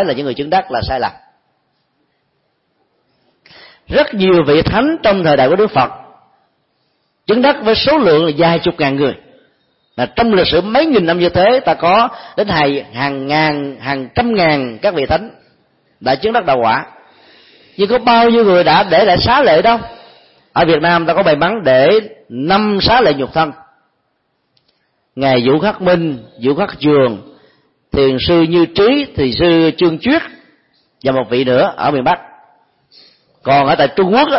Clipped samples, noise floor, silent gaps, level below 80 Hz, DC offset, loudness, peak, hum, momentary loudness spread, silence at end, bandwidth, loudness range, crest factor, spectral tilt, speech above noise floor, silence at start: under 0.1%; -65 dBFS; none; -40 dBFS; under 0.1%; -13 LUFS; 0 dBFS; none; 10 LU; 0 s; 5.8 kHz; 5 LU; 14 dB; -10 dB/octave; 53 dB; 0 s